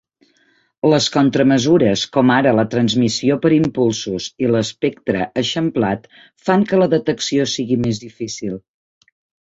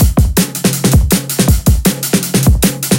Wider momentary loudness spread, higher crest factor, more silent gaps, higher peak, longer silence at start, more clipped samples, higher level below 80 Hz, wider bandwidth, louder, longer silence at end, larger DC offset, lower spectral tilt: first, 11 LU vs 3 LU; about the same, 16 dB vs 12 dB; neither; about the same, -2 dBFS vs 0 dBFS; first, 0.85 s vs 0 s; neither; second, -52 dBFS vs -16 dBFS; second, 8 kHz vs 17.5 kHz; second, -17 LUFS vs -12 LUFS; first, 0.85 s vs 0 s; neither; about the same, -5 dB/octave vs -5 dB/octave